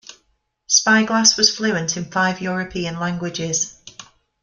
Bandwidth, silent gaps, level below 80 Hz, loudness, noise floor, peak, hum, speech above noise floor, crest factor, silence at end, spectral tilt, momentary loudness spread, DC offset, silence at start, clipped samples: 11 kHz; none; -56 dBFS; -18 LUFS; -67 dBFS; 0 dBFS; none; 48 dB; 20 dB; 0.4 s; -2 dB/octave; 11 LU; under 0.1%; 0.1 s; under 0.1%